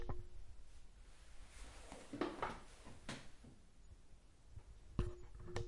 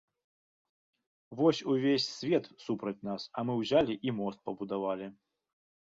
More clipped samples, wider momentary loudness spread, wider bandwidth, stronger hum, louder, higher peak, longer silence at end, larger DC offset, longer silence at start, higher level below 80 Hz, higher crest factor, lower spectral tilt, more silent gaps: neither; first, 20 LU vs 10 LU; first, 11.5 kHz vs 7.8 kHz; neither; second, -50 LUFS vs -32 LUFS; second, -22 dBFS vs -14 dBFS; second, 0 s vs 0.8 s; neither; second, 0 s vs 1.3 s; first, -54 dBFS vs -70 dBFS; first, 26 dB vs 20 dB; about the same, -5.5 dB/octave vs -6 dB/octave; neither